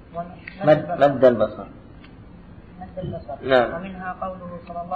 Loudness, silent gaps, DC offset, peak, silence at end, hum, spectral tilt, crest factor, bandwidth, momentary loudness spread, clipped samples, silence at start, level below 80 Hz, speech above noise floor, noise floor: -21 LUFS; none; 0.1%; -4 dBFS; 0 s; none; -8 dB/octave; 18 dB; 6 kHz; 19 LU; under 0.1%; 0 s; -48 dBFS; 22 dB; -43 dBFS